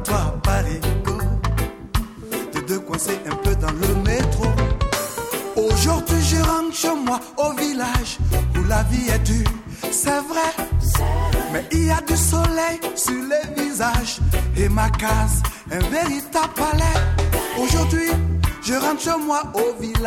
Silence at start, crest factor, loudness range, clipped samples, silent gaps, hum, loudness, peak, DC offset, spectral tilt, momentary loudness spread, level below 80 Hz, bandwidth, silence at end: 0 s; 14 dB; 2 LU; under 0.1%; none; none; -21 LUFS; -6 dBFS; under 0.1%; -4.5 dB/octave; 6 LU; -24 dBFS; 17.5 kHz; 0 s